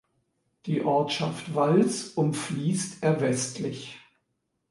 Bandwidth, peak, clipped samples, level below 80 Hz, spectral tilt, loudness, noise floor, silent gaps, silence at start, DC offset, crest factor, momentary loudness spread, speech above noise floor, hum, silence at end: 11.5 kHz; -8 dBFS; under 0.1%; -70 dBFS; -5.5 dB/octave; -27 LUFS; -78 dBFS; none; 0.65 s; under 0.1%; 18 dB; 11 LU; 52 dB; none; 0.7 s